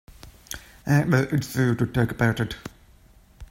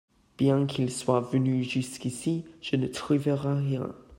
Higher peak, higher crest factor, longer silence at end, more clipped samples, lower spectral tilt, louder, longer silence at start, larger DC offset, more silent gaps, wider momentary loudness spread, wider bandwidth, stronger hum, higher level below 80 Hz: first, -6 dBFS vs -10 dBFS; about the same, 20 dB vs 18 dB; about the same, 0.05 s vs 0.05 s; neither; about the same, -6.5 dB/octave vs -6.5 dB/octave; first, -24 LUFS vs -28 LUFS; second, 0.25 s vs 0.4 s; neither; neither; first, 17 LU vs 6 LU; about the same, 16.5 kHz vs 16 kHz; neither; first, -48 dBFS vs -62 dBFS